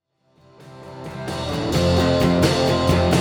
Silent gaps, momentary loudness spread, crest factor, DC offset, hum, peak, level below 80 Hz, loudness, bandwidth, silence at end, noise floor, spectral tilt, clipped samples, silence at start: none; 17 LU; 18 dB; under 0.1%; none; -2 dBFS; -38 dBFS; -19 LUFS; over 20 kHz; 0 s; -56 dBFS; -6 dB/octave; under 0.1%; 0.6 s